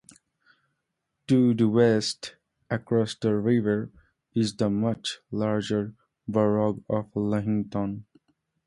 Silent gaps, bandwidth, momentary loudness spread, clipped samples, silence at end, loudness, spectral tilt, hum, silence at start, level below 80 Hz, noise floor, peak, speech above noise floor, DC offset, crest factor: none; 11.5 kHz; 12 LU; under 0.1%; 0.65 s; -26 LUFS; -6.5 dB/octave; none; 1.3 s; -60 dBFS; -80 dBFS; -8 dBFS; 56 dB; under 0.1%; 18 dB